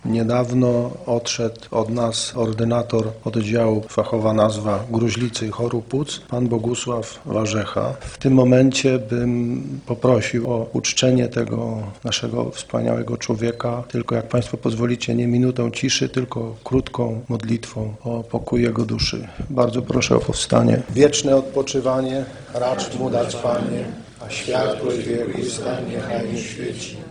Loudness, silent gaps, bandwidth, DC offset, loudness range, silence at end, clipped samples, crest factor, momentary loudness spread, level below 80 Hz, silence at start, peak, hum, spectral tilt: -21 LUFS; none; 10.5 kHz; under 0.1%; 5 LU; 0 s; under 0.1%; 20 dB; 9 LU; -44 dBFS; 0.05 s; 0 dBFS; none; -5.5 dB/octave